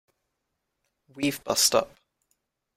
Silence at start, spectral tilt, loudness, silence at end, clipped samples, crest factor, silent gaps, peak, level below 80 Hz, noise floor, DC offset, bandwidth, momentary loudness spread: 1.15 s; -2 dB/octave; -24 LUFS; 0.9 s; under 0.1%; 24 dB; none; -6 dBFS; -64 dBFS; -81 dBFS; under 0.1%; 16 kHz; 10 LU